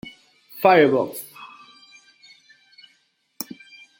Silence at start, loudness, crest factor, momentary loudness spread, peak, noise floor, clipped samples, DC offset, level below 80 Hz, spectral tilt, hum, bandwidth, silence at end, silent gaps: 0.05 s; -18 LUFS; 22 dB; 27 LU; -2 dBFS; -65 dBFS; under 0.1%; under 0.1%; -70 dBFS; -5 dB/octave; none; 17 kHz; 0.55 s; none